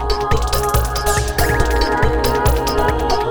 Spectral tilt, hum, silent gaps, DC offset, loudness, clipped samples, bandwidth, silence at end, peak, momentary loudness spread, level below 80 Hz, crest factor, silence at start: -4.5 dB/octave; none; none; under 0.1%; -17 LUFS; under 0.1%; over 20 kHz; 0 s; -2 dBFS; 2 LU; -20 dBFS; 14 dB; 0 s